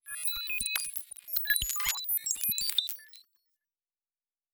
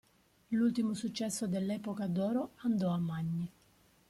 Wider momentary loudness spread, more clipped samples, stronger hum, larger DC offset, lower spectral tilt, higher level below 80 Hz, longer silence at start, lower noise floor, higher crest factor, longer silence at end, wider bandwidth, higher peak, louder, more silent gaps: first, 9 LU vs 6 LU; neither; neither; neither; second, 2 dB/octave vs -6.5 dB/octave; first, -56 dBFS vs -70 dBFS; second, 0.05 s vs 0.5 s; first, under -90 dBFS vs -67 dBFS; first, 26 dB vs 14 dB; first, 1.3 s vs 0.6 s; first, over 20 kHz vs 14.5 kHz; first, -10 dBFS vs -22 dBFS; first, -30 LUFS vs -35 LUFS; neither